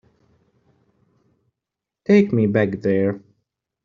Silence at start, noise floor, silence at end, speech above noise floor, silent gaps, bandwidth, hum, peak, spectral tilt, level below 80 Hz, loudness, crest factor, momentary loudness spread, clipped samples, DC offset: 2.1 s; -85 dBFS; 0.65 s; 68 dB; none; 7 kHz; none; -4 dBFS; -8 dB/octave; -62 dBFS; -19 LUFS; 20 dB; 14 LU; under 0.1%; under 0.1%